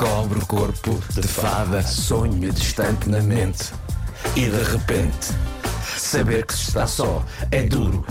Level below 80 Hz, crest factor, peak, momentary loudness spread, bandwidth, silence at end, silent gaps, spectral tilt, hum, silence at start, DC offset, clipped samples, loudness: -28 dBFS; 10 dB; -10 dBFS; 5 LU; 16.5 kHz; 0 s; none; -5 dB/octave; none; 0 s; under 0.1%; under 0.1%; -22 LUFS